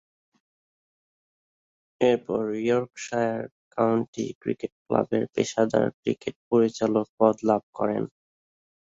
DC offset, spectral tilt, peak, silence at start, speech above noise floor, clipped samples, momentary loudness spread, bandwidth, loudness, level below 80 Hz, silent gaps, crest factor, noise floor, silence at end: under 0.1%; -6 dB/octave; -6 dBFS; 2 s; over 65 dB; under 0.1%; 9 LU; 7.8 kHz; -26 LUFS; -66 dBFS; 3.52-3.71 s, 4.08-4.13 s, 4.35-4.41 s, 4.72-4.86 s, 5.94-6.03 s, 6.36-6.51 s, 7.09-7.18 s, 7.63-7.73 s; 22 dB; under -90 dBFS; 0.75 s